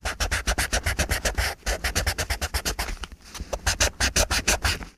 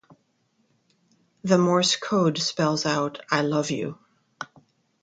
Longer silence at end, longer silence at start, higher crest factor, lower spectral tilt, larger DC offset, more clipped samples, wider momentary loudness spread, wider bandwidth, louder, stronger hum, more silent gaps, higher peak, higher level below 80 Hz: second, 0.05 s vs 0.6 s; second, 0.05 s vs 1.45 s; about the same, 22 dB vs 22 dB; second, -2 dB/octave vs -4.5 dB/octave; neither; neither; second, 10 LU vs 19 LU; first, 15.5 kHz vs 9.4 kHz; about the same, -25 LUFS vs -23 LUFS; neither; neither; about the same, -4 dBFS vs -4 dBFS; first, -32 dBFS vs -68 dBFS